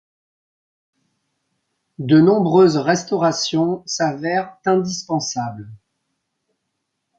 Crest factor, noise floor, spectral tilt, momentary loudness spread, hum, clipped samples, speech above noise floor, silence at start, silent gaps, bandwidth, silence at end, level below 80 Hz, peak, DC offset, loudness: 18 dB; -76 dBFS; -5.5 dB/octave; 11 LU; none; under 0.1%; 58 dB; 2 s; none; 8.8 kHz; 1.45 s; -62 dBFS; -2 dBFS; under 0.1%; -18 LUFS